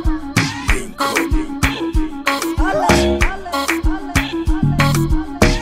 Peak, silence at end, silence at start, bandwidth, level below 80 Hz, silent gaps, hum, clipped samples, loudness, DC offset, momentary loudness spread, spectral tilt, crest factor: 0 dBFS; 0 s; 0 s; 16.5 kHz; -22 dBFS; none; none; under 0.1%; -18 LUFS; under 0.1%; 6 LU; -5 dB/octave; 16 dB